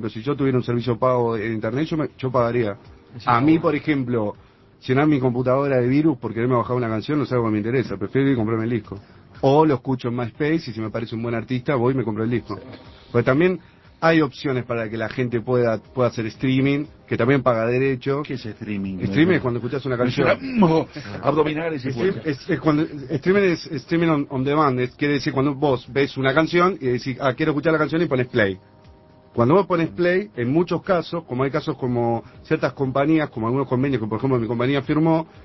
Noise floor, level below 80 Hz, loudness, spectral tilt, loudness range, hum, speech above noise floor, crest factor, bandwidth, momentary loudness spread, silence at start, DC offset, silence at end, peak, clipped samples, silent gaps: -49 dBFS; -50 dBFS; -21 LUFS; -8 dB/octave; 2 LU; none; 28 dB; 20 dB; 6 kHz; 8 LU; 0 s; under 0.1%; 0 s; -2 dBFS; under 0.1%; none